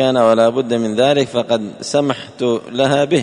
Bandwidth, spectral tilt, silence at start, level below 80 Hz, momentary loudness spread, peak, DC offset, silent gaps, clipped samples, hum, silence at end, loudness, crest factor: 10.5 kHz; -5 dB/octave; 0 s; -58 dBFS; 7 LU; 0 dBFS; under 0.1%; none; under 0.1%; none; 0 s; -16 LUFS; 14 dB